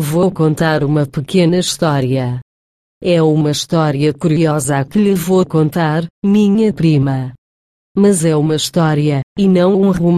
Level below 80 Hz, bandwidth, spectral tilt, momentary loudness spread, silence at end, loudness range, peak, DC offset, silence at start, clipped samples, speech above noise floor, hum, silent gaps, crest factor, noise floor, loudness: -46 dBFS; 15 kHz; -6 dB/octave; 5 LU; 0 s; 1 LU; -2 dBFS; under 0.1%; 0 s; under 0.1%; over 77 dB; none; 2.42-3.01 s, 6.10-6.22 s, 7.38-7.95 s, 9.23-9.36 s; 12 dB; under -90 dBFS; -14 LUFS